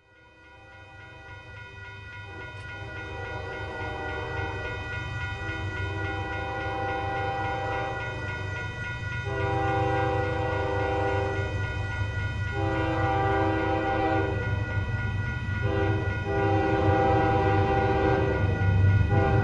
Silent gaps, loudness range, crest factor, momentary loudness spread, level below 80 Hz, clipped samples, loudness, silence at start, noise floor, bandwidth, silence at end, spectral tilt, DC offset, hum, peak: none; 11 LU; 16 dB; 16 LU; -40 dBFS; under 0.1%; -27 LUFS; 0.45 s; -54 dBFS; 7.6 kHz; 0 s; -7.5 dB/octave; under 0.1%; none; -10 dBFS